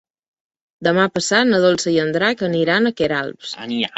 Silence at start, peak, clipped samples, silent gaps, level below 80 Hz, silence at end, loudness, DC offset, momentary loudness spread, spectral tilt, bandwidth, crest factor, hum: 0.8 s; -2 dBFS; under 0.1%; none; -56 dBFS; 0 s; -17 LUFS; under 0.1%; 8 LU; -4 dB/octave; 8.2 kHz; 18 dB; none